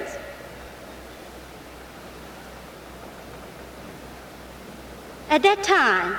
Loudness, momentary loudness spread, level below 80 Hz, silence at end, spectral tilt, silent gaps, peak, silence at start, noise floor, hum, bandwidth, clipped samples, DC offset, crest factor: -20 LUFS; 23 LU; -50 dBFS; 0 s; -3 dB/octave; none; -6 dBFS; 0 s; -42 dBFS; none; over 20 kHz; under 0.1%; under 0.1%; 22 dB